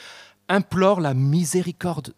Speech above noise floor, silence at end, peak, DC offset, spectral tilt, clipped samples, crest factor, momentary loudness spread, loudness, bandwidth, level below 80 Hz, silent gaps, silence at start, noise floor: 22 dB; 0.1 s; -4 dBFS; under 0.1%; -6 dB/octave; under 0.1%; 18 dB; 6 LU; -21 LUFS; 15.5 kHz; -56 dBFS; none; 0 s; -43 dBFS